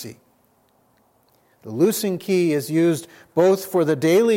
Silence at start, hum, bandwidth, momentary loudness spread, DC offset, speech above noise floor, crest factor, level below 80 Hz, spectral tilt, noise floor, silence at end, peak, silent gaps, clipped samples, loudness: 0 s; none; 17 kHz; 10 LU; under 0.1%; 42 dB; 16 dB; -72 dBFS; -5.5 dB/octave; -61 dBFS; 0 s; -6 dBFS; none; under 0.1%; -20 LUFS